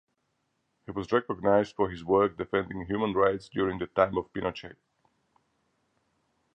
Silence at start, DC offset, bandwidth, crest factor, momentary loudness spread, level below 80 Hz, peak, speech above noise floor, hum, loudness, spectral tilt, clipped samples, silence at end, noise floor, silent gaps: 0.9 s; under 0.1%; 8.6 kHz; 22 dB; 9 LU; -56 dBFS; -8 dBFS; 49 dB; none; -28 LUFS; -7.5 dB/octave; under 0.1%; 1.8 s; -77 dBFS; none